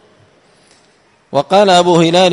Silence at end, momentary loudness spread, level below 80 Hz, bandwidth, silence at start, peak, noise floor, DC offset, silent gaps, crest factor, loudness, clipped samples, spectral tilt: 0 s; 10 LU; -56 dBFS; 11 kHz; 1.3 s; 0 dBFS; -52 dBFS; under 0.1%; none; 12 dB; -10 LUFS; under 0.1%; -5 dB/octave